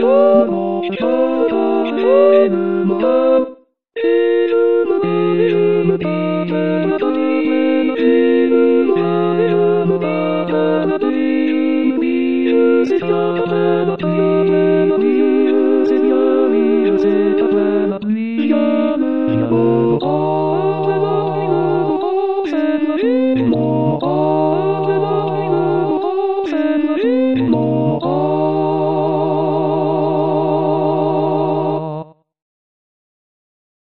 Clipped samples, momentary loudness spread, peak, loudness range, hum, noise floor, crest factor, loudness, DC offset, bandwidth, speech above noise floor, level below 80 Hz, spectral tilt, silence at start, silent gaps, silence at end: under 0.1%; 5 LU; 0 dBFS; 2 LU; none; -37 dBFS; 14 dB; -15 LUFS; 0.8%; 5.8 kHz; 22 dB; -58 dBFS; -9.5 dB/octave; 0 s; none; 1.8 s